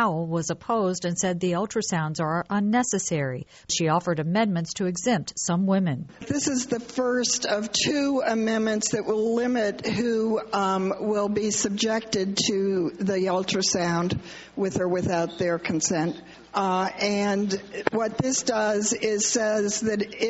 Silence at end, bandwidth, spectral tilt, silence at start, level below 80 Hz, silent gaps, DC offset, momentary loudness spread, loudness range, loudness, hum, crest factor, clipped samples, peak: 0 s; 8.2 kHz; -4 dB/octave; 0 s; -58 dBFS; none; under 0.1%; 5 LU; 1 LU; -25 LUFS; none; 22 dB; under 0.1%; -2 dBFS